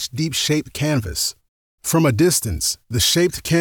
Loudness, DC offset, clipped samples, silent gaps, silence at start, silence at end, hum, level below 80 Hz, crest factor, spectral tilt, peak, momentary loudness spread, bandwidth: -19 LUFS; under 0.1%; under 0.1%; 1.48-1.78 s; 0 s; 0 s; none; -40 dBFS; 14 dB; -4 dB/octave; -6 dBFS; 7 LU; over 20 kHz